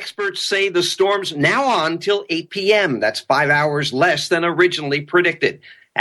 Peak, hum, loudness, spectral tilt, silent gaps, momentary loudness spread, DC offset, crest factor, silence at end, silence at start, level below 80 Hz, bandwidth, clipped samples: 0 dBFS; none; -17 LUFS; -4 dB/octave; none; 6 LU; under 0.1%; 18 dB; 0 s; 0 s; -62 dBFS; 12.5 kHz; under 0.1%